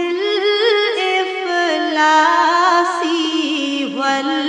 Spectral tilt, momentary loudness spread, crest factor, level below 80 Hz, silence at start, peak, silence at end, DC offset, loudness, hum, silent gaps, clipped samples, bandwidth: -1.5 dB/octave; 6 LU; 14 dB; -74 dBFS; 0 s; -2 dBFS; 0 s; under 0.1%; -15 LUFS; none; none; under 0.1%; 10 kHz